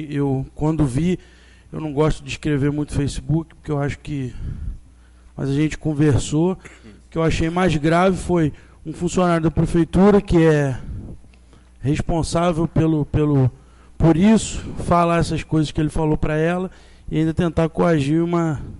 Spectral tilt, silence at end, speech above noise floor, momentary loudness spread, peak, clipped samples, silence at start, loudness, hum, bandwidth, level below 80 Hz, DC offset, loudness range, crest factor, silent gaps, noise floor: -7 dB/octave; 0 s; 29 dB; 13 LU; -6 dBFS; under 0.1%; 0 s; -20 LUFS; none; 11.5 kHz; -34 dBFS; under 0.1%; 5 LU; 14 dB; none; -47 dBFS